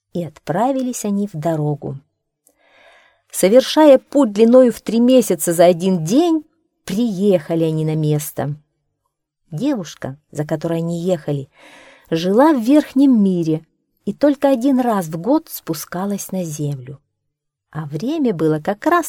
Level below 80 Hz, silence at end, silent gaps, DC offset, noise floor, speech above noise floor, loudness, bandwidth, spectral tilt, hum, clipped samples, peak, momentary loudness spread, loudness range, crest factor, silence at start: -60 dBFS; 0 s; none; under 0.1%; -76 dBFS; 60 dB; -17 LUFS; 18.5 kHz; -6 dB/octave; none; under 0.1%; 0 dBFS; 15 LU; 10 LU; 18 dB; 0.15 s